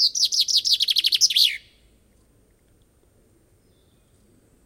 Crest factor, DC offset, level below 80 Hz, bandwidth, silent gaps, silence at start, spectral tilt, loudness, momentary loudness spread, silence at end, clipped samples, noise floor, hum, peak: 20 dB; under 0.1%; -64 dBFS; 16.5 kHz; none; 0 s; 4 dB/octave; -17 LUFS; 3 LU; 3.1 s; under 0.1%; -60 dBFS; none; -4 dBFS